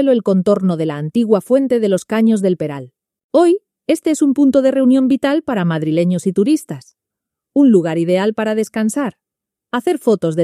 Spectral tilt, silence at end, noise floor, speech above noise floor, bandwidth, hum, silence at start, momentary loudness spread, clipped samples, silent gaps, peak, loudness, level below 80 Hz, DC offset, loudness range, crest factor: -7 dB/octave; 0 s; -83 dBFS; 69 dB; 14 kHz; none; 0 s; 8 LU; under 0.1%; 3.24-3.29 s; 0 dBFS; -15 LUFS; -62 dBFS; under 0.1%; 2 LU; 14 dB